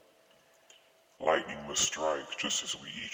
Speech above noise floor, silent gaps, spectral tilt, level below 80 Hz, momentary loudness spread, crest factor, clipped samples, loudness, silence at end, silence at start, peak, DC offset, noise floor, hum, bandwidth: 29 dB; none; -1 dB/octave; -66 dBFS; 6 LU; 22 dB; under 0.1%; -32 LUFS; 0 s; 1.2 s; -14 dBFS; under 0.1%; -64 dBFS; none; over 20 kHz